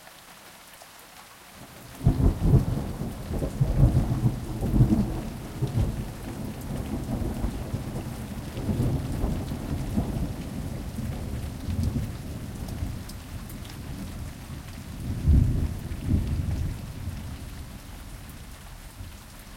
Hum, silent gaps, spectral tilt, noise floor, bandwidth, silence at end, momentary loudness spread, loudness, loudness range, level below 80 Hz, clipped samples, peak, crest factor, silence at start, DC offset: none; none; -7.5 dB/octave; -48 dBFS; 16.5 kHz; 0 s; 21 LU; -29 LUFS; 8 LU; -34 dBFS; under 0.1%; -8 dBFS; 20 dB; 0 s; under 0.1%